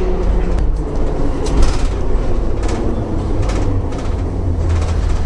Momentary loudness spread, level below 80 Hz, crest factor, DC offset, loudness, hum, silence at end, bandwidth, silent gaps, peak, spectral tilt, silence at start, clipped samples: 3 LU; -16 dBFS; 14 dB; under 0.1%; -19 LUFS; none; 0 s; 10.5 kHz; none; -2 dBFS; -7 dB/octave; 0 s; under 0.1%